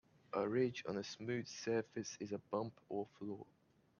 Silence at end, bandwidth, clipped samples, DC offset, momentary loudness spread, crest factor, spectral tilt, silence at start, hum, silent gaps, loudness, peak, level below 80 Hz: 0.55 s; 7.2 kHz; under 0.1%; under 0.1%; 11 LU; 18 dB; -5 dB/octave; 0.3 s; none; none; -43 LUFS; -24 dBFS; -82 dBFS